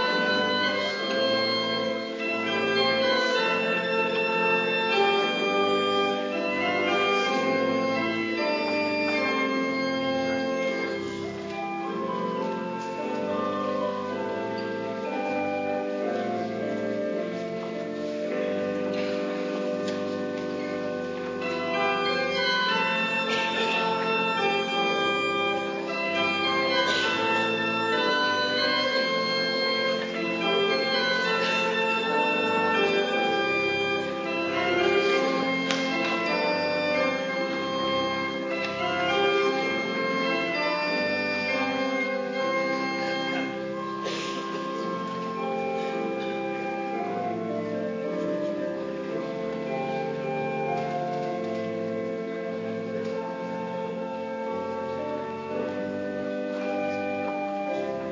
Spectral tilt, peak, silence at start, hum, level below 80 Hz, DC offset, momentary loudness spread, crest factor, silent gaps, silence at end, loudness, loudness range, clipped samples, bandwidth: -4.5 dB/octave; -6 dBFS; 0 s; none; -66 dBFS; under 0.1%; 8 LU; 22 dB; none; 0 s; -26 LUFS; 7 LU; under 0.1%; 7.6 kHz